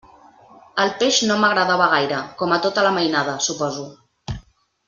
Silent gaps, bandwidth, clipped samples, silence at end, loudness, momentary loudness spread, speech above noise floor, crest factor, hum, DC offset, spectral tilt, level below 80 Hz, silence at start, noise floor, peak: none; 10 kHz; under 0.1%; 0.45 s; -19 LUFS; 17 LU; 29 dB; 18 dB; none; under 0.1%; -3 dB/octave; -50 dBFS; 0.75 s; -48 dBFS; -2 dBFS